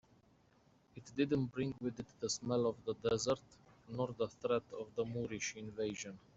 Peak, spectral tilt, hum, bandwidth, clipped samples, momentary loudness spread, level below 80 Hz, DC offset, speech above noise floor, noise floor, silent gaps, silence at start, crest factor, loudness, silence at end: -22 dBFS; -5 dB/octave; none; 8.2 kHz; under 0.1%; 9 LU; -70 dBFS; under 0.1%; 31 dB; -70 dBFS; none; 0.95 s; 18 dB; -40 LUFS; 0.15 s